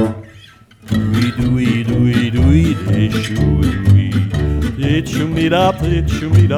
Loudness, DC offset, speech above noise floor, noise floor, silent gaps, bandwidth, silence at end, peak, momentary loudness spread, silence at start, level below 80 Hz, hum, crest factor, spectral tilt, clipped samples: -15 LUFS; under 0.1%; 29 dB; -42 dBFS; none; 13 kHz; 0 s; -2 dBFS; 6 LU; 0 s; -24 dBFS; none; 12 dB; -7 dB/octave; under 0.1%